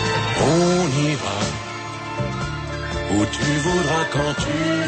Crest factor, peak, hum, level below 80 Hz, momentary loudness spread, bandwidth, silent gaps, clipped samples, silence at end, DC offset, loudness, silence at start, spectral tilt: 14 dB; -8 dBFS; none; -38 dBFS; 10 LU; 8.8 kHz; none; under 0.1%; 0 s; under 0.1%; -21 LUFS; 0 s; -5 dB/octave